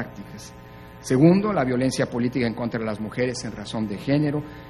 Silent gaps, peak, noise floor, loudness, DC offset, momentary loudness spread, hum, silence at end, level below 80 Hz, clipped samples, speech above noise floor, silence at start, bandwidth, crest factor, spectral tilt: none; -4 dBFS; -43 dBFS; -23 LUFS; under 0.1%; 22 LU; none; 0 s; -50 dBFS; under 0.1%; 20 dB; 0 s; 13 kHz; 20 dB; -6.5 dB/octave